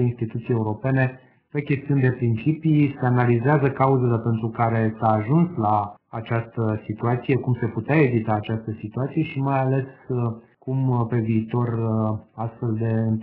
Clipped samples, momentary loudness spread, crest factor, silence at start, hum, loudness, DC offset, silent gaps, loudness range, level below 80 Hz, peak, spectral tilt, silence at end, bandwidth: under 0.1%; 9 LU; 18 dB; 0 s; none; -23 LUFS; under 0.1%; none; 4 LU; -56 dBFS; -4 dBFS; -8.5 dB/octave; 0 s; 4.2 kHz